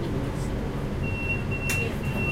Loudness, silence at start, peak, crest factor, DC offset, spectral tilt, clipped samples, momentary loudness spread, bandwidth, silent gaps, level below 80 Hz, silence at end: -28 LUFS; 0 s; -12 dBFS; 14 dB; under 0.1%; -5.5 dB/octave; under 0.1%; 4 LU; 16 kHz; none; -36 dBFS; 0 s